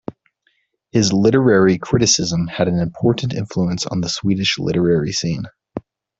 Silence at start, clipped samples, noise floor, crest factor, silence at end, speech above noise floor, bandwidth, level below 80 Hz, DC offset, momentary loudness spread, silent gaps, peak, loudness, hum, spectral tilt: 0.95 s; under 0.1%; -65 dBFS; 16 dB; 0.4 s; 48 dB; 8 kHz; -48 dBFS; under 0.1%; 13 LU; none; -2 dBFS; -17 LUFS; none; -4.5 dB/octave